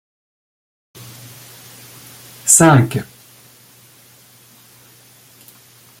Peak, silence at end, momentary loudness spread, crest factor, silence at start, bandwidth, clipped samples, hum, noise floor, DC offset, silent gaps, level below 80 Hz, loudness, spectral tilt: 0 dBFS; 2.95 s; 29 LU; 20 dB; 2.45 s; 17 kHz; under 0.1%; none; -47 dBFS; under 0.1%; none; -56 dBFS; -12 LUFS; -4.5 dB/octave